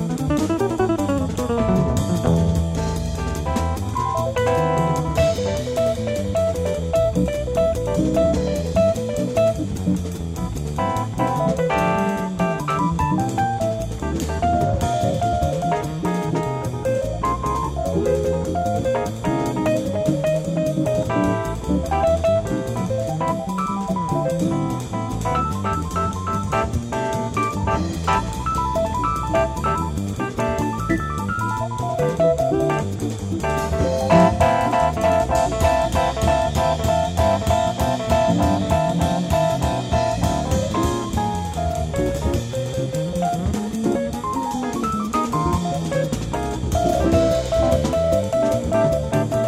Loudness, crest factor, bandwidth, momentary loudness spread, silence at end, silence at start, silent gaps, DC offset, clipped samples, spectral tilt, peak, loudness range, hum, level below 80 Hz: -21 LUFS; 16 dB; 16 kHz; 5 LU; 0 s; 0 s; none; under 0.1%; under 0.1%; -6.5 dB/octave; -4 dBFS; 4 LU; none; -32 dBFS